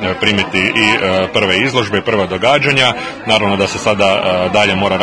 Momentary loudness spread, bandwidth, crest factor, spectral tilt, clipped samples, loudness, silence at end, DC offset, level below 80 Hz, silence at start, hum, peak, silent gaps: 4 LU; 11 kHz; 14 dB; -4 dB/octave; 0.1%; -12 LUFS; 0 s; 0.2%; -46 dBFS; 0 s; none; 0 dBFS; none